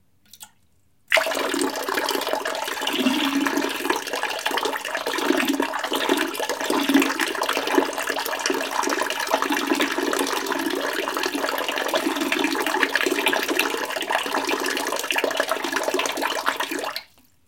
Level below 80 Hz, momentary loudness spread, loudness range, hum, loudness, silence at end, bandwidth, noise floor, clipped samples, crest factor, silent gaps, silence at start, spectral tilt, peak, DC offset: -68 dBFS; 5 LU; 1 LU; none; -23 LUFS; 0.45 s; 17 kHz; -65 dBFS; under 0.1%; 22 dB; none; 0.35 s; -1 dB/octave; -2 dBFS; under 0.1%